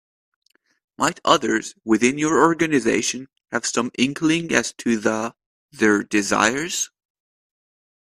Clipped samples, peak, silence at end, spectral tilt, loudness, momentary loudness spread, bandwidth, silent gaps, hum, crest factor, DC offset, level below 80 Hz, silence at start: under 0.1%; 0 dBFS; 1.25 s; -3.5 dB/octave; -20 LUFS; 8 LU; 14.5 kHz; 5.46-5.69 s; none; 22 dB; under 0.1%; -60 dBFS; 1 s